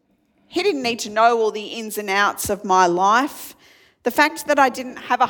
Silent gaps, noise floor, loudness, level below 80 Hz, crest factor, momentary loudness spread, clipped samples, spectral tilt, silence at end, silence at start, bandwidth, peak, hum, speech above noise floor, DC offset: none; -62 dBFS; -19 LUFS; -58 dBFS; 18 dB; 11 LU; under 0.1%; -3 dB/octave; 0 s; 0.5 s; 19 kHz; -2 dBFS; none; 43 dB; under 0.1%